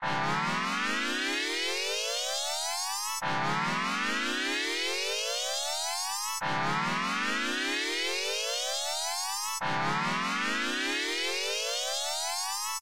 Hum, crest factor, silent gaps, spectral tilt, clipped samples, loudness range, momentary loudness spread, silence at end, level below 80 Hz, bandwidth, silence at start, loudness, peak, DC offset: none; 12 dB; none; -1.5 dB/octave; under 0.1%; 0 LU; 2 LU; 0 s; -68 dBFS; 16 kHz; 0 s; -29 LUFS; -20 dBFS; 0.3%